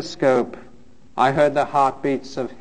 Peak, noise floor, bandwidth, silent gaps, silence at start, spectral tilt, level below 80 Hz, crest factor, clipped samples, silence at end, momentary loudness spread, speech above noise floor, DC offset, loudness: -2 dBFS; -50 dBFS; 9.6 kHz; none; 0 s; -6 dB/octave; -54 dBFS; 18 dB; under 0.1%; 0.05 s; 13 LU; 31 dB; 0.8%; -20 LUFS